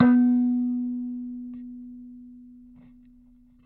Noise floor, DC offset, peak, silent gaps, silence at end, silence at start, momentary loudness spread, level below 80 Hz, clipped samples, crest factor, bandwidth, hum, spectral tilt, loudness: -55 dBFS; under 0.1%; -6 dBFS; none; 1.2 s; 0 s; 26 LU; -60 dBFS; under 0.1%; 20 dB; 2.9 kHz; none; -10.5 dB/octave; -25 LUFS